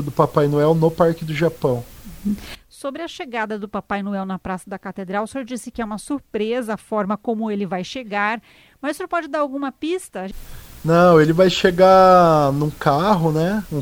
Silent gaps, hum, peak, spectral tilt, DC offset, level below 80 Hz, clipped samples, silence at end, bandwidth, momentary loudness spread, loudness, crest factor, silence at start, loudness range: none; none; 0 dBFS; -6.5 dB/octave; under 0.1%; -46 dBFS; under 0.1%; 0 s; 19.5 kHz; 17 LU; -19 LUFS; 18 dB; 0 s; 12 LU